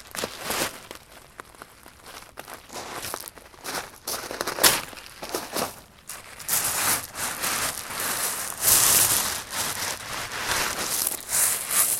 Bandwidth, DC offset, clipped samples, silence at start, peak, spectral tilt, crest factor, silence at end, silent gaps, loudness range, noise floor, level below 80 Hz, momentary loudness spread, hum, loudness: 17 kHz; under 0.1%; under 0.1%; 0 s; 0 dBFS; 0 dB/octave; 28 dB; 0 s; none; 13 LU; -47 dBFS; -54 dBFS; 22 LU; none; -23 LUFS